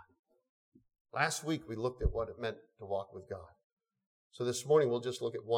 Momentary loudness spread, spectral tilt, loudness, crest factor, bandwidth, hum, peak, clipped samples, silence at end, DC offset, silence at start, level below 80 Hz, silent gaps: 17 LU; -4.5 dB/octave; -35 LUFS; 22 dB; 16.5 kHz; none; -14 dBFS; under 0.1%; 0 s; under 0.1%; 1.15 s; -50 dBFS; 3.64-3.77 s, 4.06-4.31 s